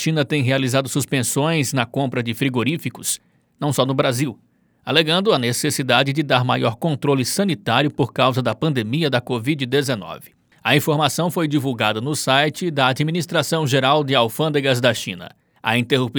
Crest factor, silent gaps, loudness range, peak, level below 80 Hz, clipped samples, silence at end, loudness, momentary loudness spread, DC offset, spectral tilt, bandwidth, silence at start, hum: 20 dB; none; 3 LU; 0 dBFS; -64 dBFS; under 0.1%; 0 s; -19 LUFS; 7 LU; under 0.1%; -4.5 dB/octave; over 20 kHz; 0 s; none